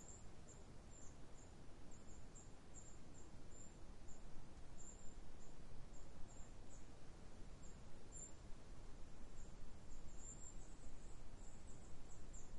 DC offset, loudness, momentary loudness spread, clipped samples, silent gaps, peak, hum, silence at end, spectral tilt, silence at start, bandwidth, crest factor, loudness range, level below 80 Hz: under 0.1%; -61 LUFS; 5 LU; under 0.1%; none; -38 dBFS; none; 0 s; -4.5 dB/octave; 0 s; 11 kHz; 12 dB; 2 LU; -58 dBFS